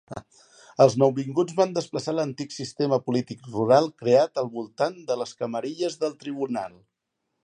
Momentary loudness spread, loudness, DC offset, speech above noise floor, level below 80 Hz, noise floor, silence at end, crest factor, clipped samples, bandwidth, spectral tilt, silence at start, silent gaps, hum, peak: 13 LU; -25 LUFS; under 0.1%; 55 dB; -68 dBFS; -80 dBFS; 0.75 s; 20 dB; under 0.1%; 10 kHz; -6 dB/octave; 0.1 s; none; none; -4 dBFS